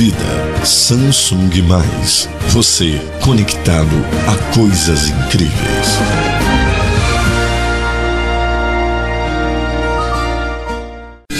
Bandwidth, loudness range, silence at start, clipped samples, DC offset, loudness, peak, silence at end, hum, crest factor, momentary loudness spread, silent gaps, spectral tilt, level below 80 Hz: 14.5 kHz; 4 LU; 0 s; under 0.1%; under 0.1%; -13 LUFS; 0 dBFS; 0 s; none; 12 dB; 7 LU; none; -4 dB/octave; -20 dBFS